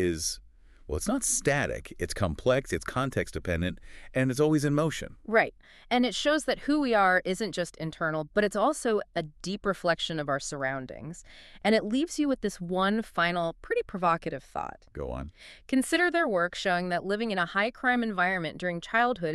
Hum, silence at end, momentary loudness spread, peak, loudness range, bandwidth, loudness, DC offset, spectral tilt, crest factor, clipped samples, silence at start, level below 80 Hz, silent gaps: none; 0 s; 11 LU; -8 dBFS; 3 LU; 13.5 kHz; -28 LUFS; under 0.1%; -4.5 dB/octave; 20 dB; under 0.1%; 0 s; -50 dBFS; none